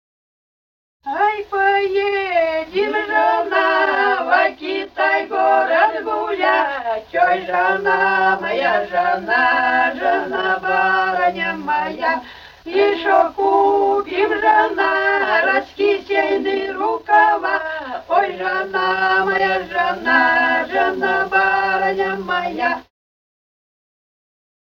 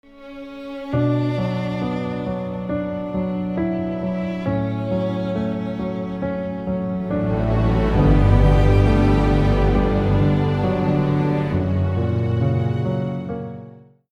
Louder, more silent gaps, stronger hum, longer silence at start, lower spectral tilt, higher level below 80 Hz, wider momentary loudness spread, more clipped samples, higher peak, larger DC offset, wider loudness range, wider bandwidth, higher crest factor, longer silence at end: first, -17 LUFS vs -21 LUFS; neither; neither; first, 1.05 s vs 0.15 s; second, -5 dB/octave vs -9 dB/octave; second, -54 dBFS vs -26 dBFS; second, 7 LU vs 10 LU; neither; about the same, -2 dBFS vs -2 dBFS; neither; second, 2 LU vs 7 LU; about the same, 6.8 kHz vs 7.4 kHz; about the same, 16 dB vs 16 dB; first, 2 s vs 0.35 s